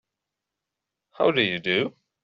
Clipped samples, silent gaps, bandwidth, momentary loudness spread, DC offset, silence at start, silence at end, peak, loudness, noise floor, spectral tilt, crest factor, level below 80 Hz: under 0.1%; none; 7.4 kHz; 5 LU; under 0.1%; 1.2 s; 0.35 s; -8 dBFS; -24 LUFS; -85 dBFS; -2 dB/octave; 20 dB; -68 dBFS